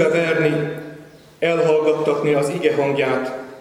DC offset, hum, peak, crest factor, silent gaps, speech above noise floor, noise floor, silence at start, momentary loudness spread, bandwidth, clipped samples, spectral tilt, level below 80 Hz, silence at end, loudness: under 0.1%; none; -2 dBFS; 16 dB; none; 23 dB; -42 dBFS; 0 s; 11 LU; 13 kHz; under 0.1%; -6 dB/octave; -62 dBFS; 0 s; -19 LUFS